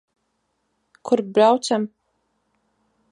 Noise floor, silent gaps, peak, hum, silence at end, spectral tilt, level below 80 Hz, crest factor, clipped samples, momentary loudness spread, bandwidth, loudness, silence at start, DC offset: -72 dBFS; none; -4 dBFS; none; 1.25 s; -4.5 dB/octave; -76 dBFS; 20 dB; under 0.1%; 15 LU; 11 kHz; -20 LUFS; 1.05 s; under 0.1%